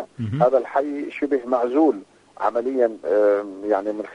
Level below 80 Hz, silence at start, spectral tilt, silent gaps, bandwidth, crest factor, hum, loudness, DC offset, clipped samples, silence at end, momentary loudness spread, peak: -66 dBFS; 0 s; -8.5 dB/octave; none; 9.8 kHz; 16 dB; none; -21 LUFS; under 0.1%; under 0.1%; 0 s; 8 LU; -6 dBFS